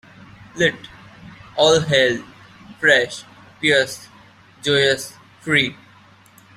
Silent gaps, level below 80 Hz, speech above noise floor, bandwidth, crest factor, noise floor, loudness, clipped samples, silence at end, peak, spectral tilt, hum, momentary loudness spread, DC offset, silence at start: none; -56 dBFS; 31 dB; 15.5 kHz; 20 dB; -49 dBFS; -18 LUFS; under 0.1%; 0.85 s; 0 dBFS; -3.5 dB/octave; none; 19 LU; under 0.1%; 0.55 s